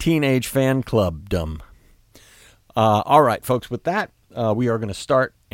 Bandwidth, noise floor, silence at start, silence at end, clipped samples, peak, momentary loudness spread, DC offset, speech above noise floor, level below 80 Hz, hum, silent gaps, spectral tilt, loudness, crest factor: 17 kHz; -51 dBFS; 0 s; 0.25 s; under 0.1%; -2 dBFS; 10 LU; under 0.1%; 32 dB; -44 dBFS; none; none; -6 dB/octave; -20 LUFS; 18 dB